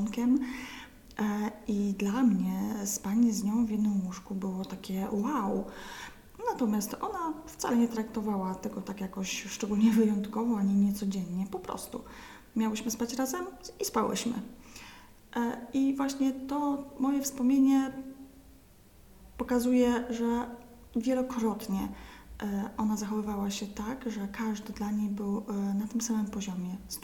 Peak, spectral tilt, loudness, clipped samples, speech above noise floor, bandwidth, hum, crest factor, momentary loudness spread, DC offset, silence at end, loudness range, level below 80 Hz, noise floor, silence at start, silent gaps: -14 dBFS; -5.5 dB/octave; -31 LUFS; under 0.1%; 26 dB; 18.5 kHz; none; 16 dB; 14 LU; under 0.1%; 0 s; 4 LU; -56 dBFS; -57 dBFS; 0 s; none